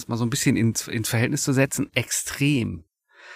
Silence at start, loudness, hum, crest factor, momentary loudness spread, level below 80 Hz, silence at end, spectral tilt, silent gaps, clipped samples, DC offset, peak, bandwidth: 0 s; -23 LUFS; none; 20 dB; 5 LU; -54 dBFS; 0 s; -4.5 dB/octave; none; under 0.1%; under 0.1%; -4 dBFS; 15.5 kHz